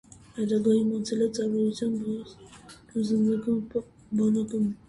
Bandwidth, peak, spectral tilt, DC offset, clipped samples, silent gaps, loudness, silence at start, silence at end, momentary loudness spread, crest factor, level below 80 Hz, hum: 11 kHz; -12 dBFS; -7 dB/octave; under 0.1%; under 0.1%; none; -27 LUFS; 0.35 s; 0.15 s; 11 LU; 16 dB; -62 dBFS; none